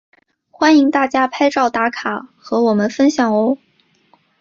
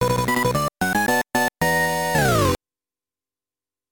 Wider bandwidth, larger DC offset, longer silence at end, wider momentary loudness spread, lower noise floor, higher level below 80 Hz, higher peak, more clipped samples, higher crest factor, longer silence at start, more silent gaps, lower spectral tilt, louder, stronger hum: second, 7.4 kHz vs 19.5 kHz; neither; second, 0.85 s vs 1.35 s; first, 11 LU vs 4 LU; second, -56 dBFS vs under -90 dBFS; second, -60 dBFS vs -42 dBFS; first, -2 dBFS vs -6 dBFS; neither; about the same, 14 dB vs 16 dB; first, 0.6 s vs 0 s; neither; about the same, -5 dB/octave vs -4.5 dB/octave; first, -16 LUFS vs -20 LUFS; neither